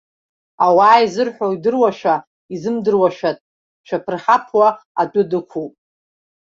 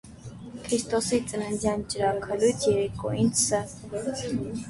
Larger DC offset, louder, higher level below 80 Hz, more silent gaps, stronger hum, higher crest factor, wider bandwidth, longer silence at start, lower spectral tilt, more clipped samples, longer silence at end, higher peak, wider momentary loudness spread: neither; first, -16 LUFS vs -27 LUFS; second, -64 dBFS vs -52 dBFS; first, 2.27-2.49 s, 3.41-3.84 s, 4.85-4.95 s vs none; neither; about the same, 16 dB vs 16 dB; second, 7.6 kHz vs 12 kHz; first, 0.6 s vs 0.05 s; first, -6 dB/octave vs -4.5 dB/octave; neither; first, 0.8 s vs 0 s; first, -2 dBFS vs -10 dBFS; about the same, 14 LU vs 12 LU